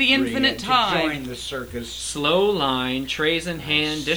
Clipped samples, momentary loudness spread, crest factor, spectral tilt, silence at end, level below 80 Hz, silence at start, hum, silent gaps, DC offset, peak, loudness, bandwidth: under 0.1%; 11 LU; 18 dB; -3.5 dB/octave; 0 s; -46 dBFS; 0 s; none; none; under 0.1%; -4 dBFS; -21 LUFS; over 20 kHz